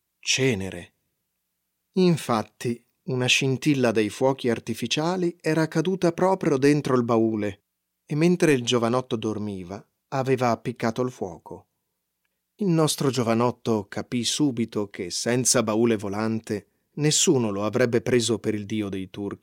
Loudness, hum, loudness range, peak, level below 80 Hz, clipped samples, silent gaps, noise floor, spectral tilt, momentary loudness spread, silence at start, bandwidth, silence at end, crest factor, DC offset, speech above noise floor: -24 LUFS; none; 4 LU; -6 dBFS; -68 dBFS; under 0.1%; none; -78 dBFS; -4.5 dB/octave; 11 LU; 0.25 s; 16.5 kHz; 0.05 s; 18 dB; under 0.1%; 55 dB